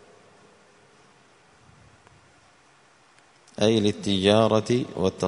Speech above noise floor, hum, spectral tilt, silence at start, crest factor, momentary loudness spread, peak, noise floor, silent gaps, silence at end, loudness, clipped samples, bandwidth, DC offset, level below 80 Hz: 36 dB; none; -5.5 dB/octave; 3.6 s; 24 dB; 8 LU; -4 dBFS; -58 dBFS; none; 0 s; -22 LUFS; under 0.1%; 11 kHz; under 0.1%; -60 dBFS